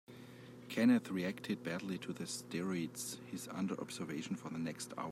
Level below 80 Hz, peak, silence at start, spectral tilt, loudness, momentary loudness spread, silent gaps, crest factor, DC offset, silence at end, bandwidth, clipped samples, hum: -80 dBFS; -22 dBFS; 0.1 s; -5 dB/octave; -39 LUFS; 13 LU; none; 18 dB; under 0.1%; 0 s; 15.5 kHz; under 0.1%; none